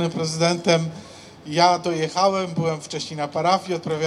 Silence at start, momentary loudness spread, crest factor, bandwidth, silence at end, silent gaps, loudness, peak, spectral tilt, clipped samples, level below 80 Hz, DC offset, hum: 0 s; 12 LU; 18 dB; 12 kHz; 0 s; none; -22 LUFS; -4 dBFS; -4.5 dB/octave; under 0.1%; -62 dBFS; under 0.1%; none